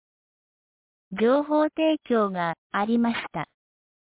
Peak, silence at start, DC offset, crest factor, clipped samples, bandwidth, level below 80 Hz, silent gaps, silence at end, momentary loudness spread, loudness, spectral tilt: -12 dBFS; 1.1 s; under 0.1%; 14 dB; under 0.1%; 4 kHz; -66 dBFS; 2.58-2.70 s; 0.6 s; 12 LU; -24 LUFS; -10 dB/octave